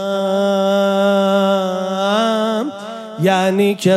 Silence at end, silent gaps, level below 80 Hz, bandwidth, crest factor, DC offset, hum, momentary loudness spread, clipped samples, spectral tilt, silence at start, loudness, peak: 0 s; none; -66 dBFS; 14 kHz; 14 dB; under 0.1%; none; 6 LU; under 0.1%; -5.5 dB/octave; 0 s; -16 LUFS; -2 dBFS